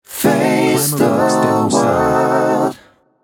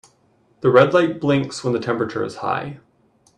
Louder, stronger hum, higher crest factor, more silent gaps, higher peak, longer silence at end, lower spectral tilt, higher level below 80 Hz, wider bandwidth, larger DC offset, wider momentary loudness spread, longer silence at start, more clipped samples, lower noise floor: first, -14 LUFS vs -19 LUFS; neither; second, 14 dB vs 20 dB; neither; about the same, 0 dBFS vs 0 dBFS; second, 0.45 s vs 0.6 s; second, -5 dB/octave vs -6.5 dB/octave; first, -48 dBFS vs -60 dBFS; first, over 20 kHz vs 10.5 kHz; neither; second, 2 LU vs 11 LU; second, 0.1 s vs 0.65 s; neither; second, -46 dBFS vs -59 dBFS